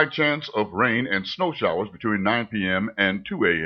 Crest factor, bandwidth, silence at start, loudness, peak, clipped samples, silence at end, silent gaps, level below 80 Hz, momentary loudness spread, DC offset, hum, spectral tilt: 18 dB; 6.6 kHz; 0 s; -23 LUFS; -6 dBFS; under 0.1%; 0 s; none; -58 dBFS; 5 LU; under 0.1%; none; -7 dB/octave